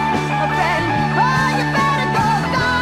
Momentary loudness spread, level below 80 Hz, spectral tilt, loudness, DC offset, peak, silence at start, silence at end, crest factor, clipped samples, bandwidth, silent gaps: 3 LU; -40 dBFS; -5.5 dB/octave; -17 LUFS; under 0.1%; -4 dBFS; 0 s; 0 s; 12 dB; under 0.1%; 15 kHz; none